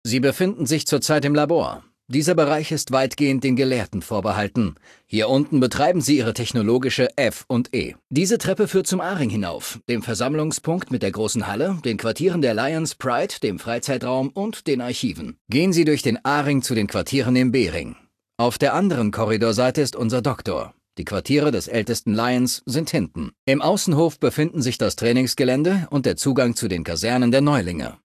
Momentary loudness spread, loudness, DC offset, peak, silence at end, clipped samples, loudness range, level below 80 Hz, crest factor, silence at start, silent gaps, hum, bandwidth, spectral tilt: 8 LU; -21 LUFS; under 0.1%; -4 dBFS; 0.1 s; under 0.1%; 3 LU; -48 dBFS; 16 dB; 0.05 s; 15.41-15.45 s, 23.39-23.47 s; none; 14.5 kHz; -5 dB/octave